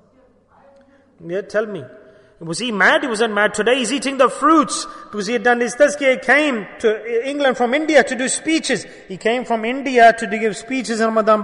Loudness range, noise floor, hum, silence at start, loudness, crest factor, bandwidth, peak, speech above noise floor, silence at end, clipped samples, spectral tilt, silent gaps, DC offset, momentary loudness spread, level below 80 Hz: 3 LU; -54 dBFS; none; 1.2 s; -17 LUFS; 16 dB; 11 kHz; -2 dBFS; 37 dB; 0 s; under 0.1%; -3 dB/octave; none; under 0.1%; 11 LU; -58 dBFS